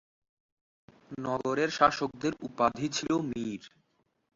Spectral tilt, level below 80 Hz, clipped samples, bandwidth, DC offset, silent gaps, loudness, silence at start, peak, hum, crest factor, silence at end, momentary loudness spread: -4.5 dB/octave; -64 dBFS; under 0.1%; 7.8 kHz; under 0.1%; none; -30 LUFS; 1.1 s; -8 dBFS; none; 24 dB; 0.65 s; 13 LU